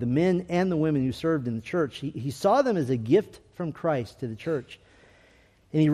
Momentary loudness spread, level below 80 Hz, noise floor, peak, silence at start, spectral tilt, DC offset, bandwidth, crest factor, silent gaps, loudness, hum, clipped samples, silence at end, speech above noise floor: 11 LU; -60 dBFS; -59 dBFS; -10 dBFS; 0 s; -7.5 dB/octave; under 0.1%; 14 kHz; 16 dB; none; -27 LUFS; none; under 0.1%; 0 s; 33 dB